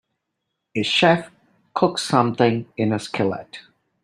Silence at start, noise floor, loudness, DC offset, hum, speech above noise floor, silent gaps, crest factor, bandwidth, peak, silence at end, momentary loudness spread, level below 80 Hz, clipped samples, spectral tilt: 0.75 s; -78 dBFS; -21 LUFS; under 0.1%; none; 58 dB; none; 20 dB; 13.5 kHz; -2 dBFS; 0.45 s; 14 LU; -62 dBFS; under 0.1%; -5 dB/octave